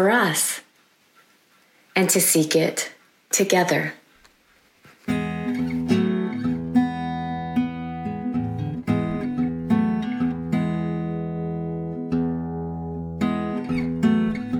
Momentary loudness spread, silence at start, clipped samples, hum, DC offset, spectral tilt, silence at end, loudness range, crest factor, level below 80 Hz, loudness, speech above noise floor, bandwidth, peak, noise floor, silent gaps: 11 LU; 0 s; under 0.1%; none; under 0.1%; -4.5 dB/octave; 0 s; 5 LU; 18 dB; -50 dBFS; -23 LUFS; 40 dB; 17 kHz; -6 dBFS; -60 dBFS; none